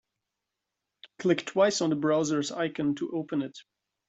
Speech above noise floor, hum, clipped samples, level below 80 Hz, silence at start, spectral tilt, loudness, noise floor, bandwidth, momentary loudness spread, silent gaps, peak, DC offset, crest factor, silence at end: 58 dB; none; under 0.1%; -72 dBFS; 1.2 s; -5 dB/octave; -28 LUFS; -86 dBFS; 8.2 kHz; 8 LU; none; -10 dBFS; under 0.1%; 20 dB; 0.45 s